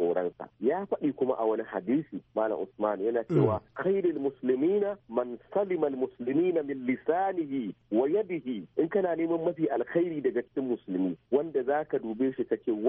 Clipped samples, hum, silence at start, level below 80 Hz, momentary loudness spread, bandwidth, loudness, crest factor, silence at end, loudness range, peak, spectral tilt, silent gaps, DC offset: under 0.1%; none; 0 s; -68 dBFS; 6 LU; 3.8 kHz; -30 LUFS; 16 dB; 0 s; 1 LU; -12 dBFS; -7.5 dB/octave; none; under 0.1%